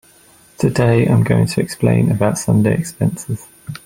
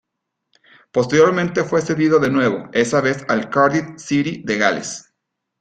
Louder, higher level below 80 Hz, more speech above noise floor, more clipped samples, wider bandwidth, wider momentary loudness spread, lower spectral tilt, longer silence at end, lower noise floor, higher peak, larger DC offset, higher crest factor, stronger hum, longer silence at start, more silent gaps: about the same, -16 LUFS vs -18 LUFS; first, -44 dBFS vs -56 dBFS; second, 33 dB vs 61 dB; neither; first, 16 kHz vs 9.4 kHz; first, 12 LU vs 8 LU; first, -7 dB/octave vs -5 dB/octave; second, 0.1 s vs 0.6 s; second, -48 dBFS vs -78 dBFS; about the same, -2 dBFS vs -2 dBFS; neither; about the same, 14 dB vs 16 dB; neither; second, 0.6 s vs 0.95 s; neither